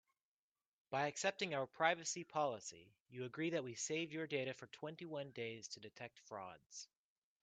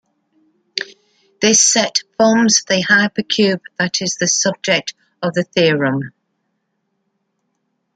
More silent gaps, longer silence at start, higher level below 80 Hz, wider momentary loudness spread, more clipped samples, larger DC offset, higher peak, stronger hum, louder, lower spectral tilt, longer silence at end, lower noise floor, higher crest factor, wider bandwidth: first, 3.00-3.06 s, 6.66-6.70 s vs none; first, 0.9 s vs 0.75 s; second, -88 dBFS vs -64 dBFS; about the same, 16 LU vs 14 LU; neither; neither; second, -20 dBFS vs 0 dBFS; neither; second, -43 LUFS vs -15 LUFS; about the same, -3.5 dB/octave vs -2.5 dB/octave; second, 0.55 s vs 1.85 s; first, under -90 dBFS vs -70 dBFS; first, 26 dB vs 18 dB; second, 9 kHz vs 10.5 kHz